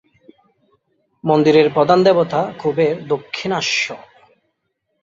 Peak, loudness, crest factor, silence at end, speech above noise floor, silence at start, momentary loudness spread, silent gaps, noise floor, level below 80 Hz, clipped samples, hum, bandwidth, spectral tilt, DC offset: -2 dBFS; -16 LUFS; 16 dB; 1.05 s; 56 dB; 1.25 s; 10 LU; none; -72 dBFS; -60 dBFS; under 0.1%; none; 7.6 kHz; -5 dB/octave; under 0.1%